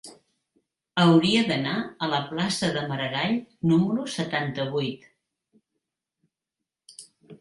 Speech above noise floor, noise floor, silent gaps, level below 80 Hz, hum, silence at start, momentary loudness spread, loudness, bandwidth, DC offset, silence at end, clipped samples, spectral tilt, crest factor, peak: 63 dB; -87 dBFS; none; -64 dBFS; none; 0.05 s; 10 LU; -25 LUFS; 11.5 kHz; under 0.1%; 0.05 s; under 0.1%; -5.5 dB/octave; 20 dB; -6 dBFS